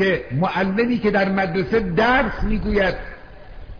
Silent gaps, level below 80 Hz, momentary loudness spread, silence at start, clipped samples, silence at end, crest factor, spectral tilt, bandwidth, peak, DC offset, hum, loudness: none; -32 dBFS; 6 LU; 0 s; under 0.1%; 0 s; 14 dB; -7.5 dB/octave; 5.4 kHz; -6 dBFS; 0.5%; none; -20 LUFS